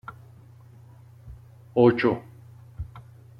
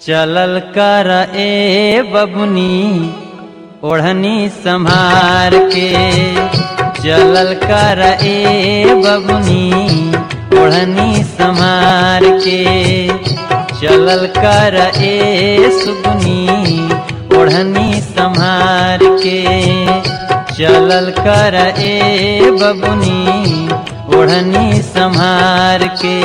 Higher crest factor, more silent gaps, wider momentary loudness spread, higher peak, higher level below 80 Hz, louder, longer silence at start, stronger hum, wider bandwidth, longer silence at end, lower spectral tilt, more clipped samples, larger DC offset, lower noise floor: first, 22 dB vs 10 dB; neither; first, 28 LU vs 6 LU; second, -6 dBFS vs 0 dBFS; second, -52 dBFS vs -36 dBFS; second, -22 LUFS vs -10 LUFS; about the same, 0.1 s vs 0 s; neither; second, 5.6 kHz vs 11 kHz; first, 0.4 s vs 0 s; first, -9 dB/octave vs -5.5 dB/octave; neither; neither; first, -49 dBFS vs -31 dBFS